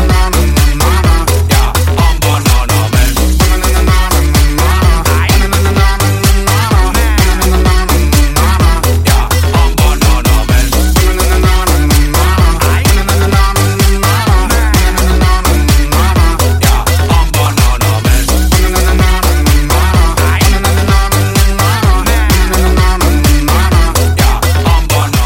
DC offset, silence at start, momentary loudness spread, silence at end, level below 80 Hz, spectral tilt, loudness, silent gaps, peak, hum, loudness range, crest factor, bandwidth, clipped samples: under 0.1%; 0 s; 1 LU; 0 s; -10 dBFS; -4.5 dB/octave; -10 LUFS; none; 0 dBFS; none; 0 LU; 8 dB; 17 kHz; under 0.1%